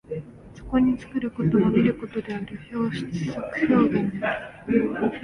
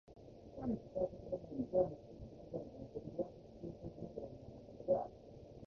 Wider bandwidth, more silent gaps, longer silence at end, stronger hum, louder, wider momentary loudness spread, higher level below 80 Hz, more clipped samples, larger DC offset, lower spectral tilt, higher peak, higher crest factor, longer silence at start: first, 10.5 kHz vs 6.6 kHz; neither; about the same, 0 s vs 0 s; neither; first, -24 LUFS vs -43 LUFS; second, 13 LU vs 17 LU; first, -48 dBFS vs -64 dBFS; neither; neither; second, -8 dB/octave vs -10 dB/octave; first, -6 dBFS vs -20 dBFS; about the same, 18 dB vs 22 dB; about the same, 0.1 s vs 0.05 s